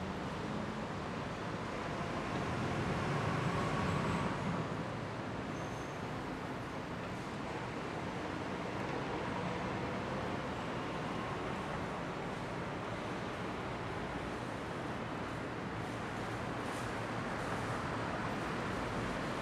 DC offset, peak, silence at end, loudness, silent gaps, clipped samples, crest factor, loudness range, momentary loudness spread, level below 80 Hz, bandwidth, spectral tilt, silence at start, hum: under 0.1%; -24 dBFS; 0 s; -39 LUFS; none; under 0.1%; 16 dB; 4 LU; 6 LU; -56 dBFS; 14 kHz; -6 dB/octave; 0 s; none